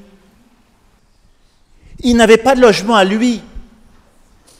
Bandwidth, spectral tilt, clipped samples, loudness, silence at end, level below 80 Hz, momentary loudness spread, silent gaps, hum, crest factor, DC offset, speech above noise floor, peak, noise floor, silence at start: 15.5 kHz; -4.5 dB/octave; 0.2%; -11 LUFS; 1 s; -38 dBFS; 10 LU; none; none; 16 dB; under 0.1%; 42 dB; 0 dBFS; -52 dBFS; 1.95 s